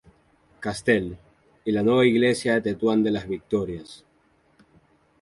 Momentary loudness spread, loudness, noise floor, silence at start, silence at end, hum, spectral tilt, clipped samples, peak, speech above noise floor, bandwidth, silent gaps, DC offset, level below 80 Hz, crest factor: 15 LU; -23 LUFS; -63 dBFS; 0.6 s; 1.25 s; none; -6 dB/octave; under 0.1%; -6 dBFS; 40 dB; 11.5 kHz; none; under 0.1%; -54 dBFS; 20 dB